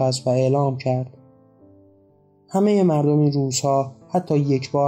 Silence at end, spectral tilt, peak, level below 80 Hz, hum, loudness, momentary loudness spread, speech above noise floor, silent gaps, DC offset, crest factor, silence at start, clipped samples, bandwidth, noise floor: 0 s; -6.5 dB/octave; -8 dBFS; -68 dBFS; none; -20 LUFS; 8 LU; 37 dB; none; under 0.1%; 14 dB; 0 s; under 0.1%; 16 kHz; -56 dBFS